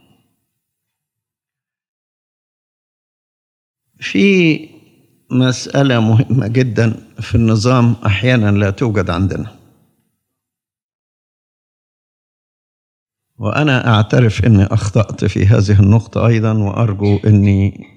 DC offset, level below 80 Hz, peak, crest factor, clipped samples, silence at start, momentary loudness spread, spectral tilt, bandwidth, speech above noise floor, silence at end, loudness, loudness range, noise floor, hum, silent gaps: under 0.1%; -46 dBFS; 0 dBFS; 14 dB; under 0.1%; 4 s; 8 LU; -7 dB/octave; 9.2 kHz; 74 dB; 0.15 s; -13 LUFS; 10 LU; -87 dBFS; none; 10.83-13.06 s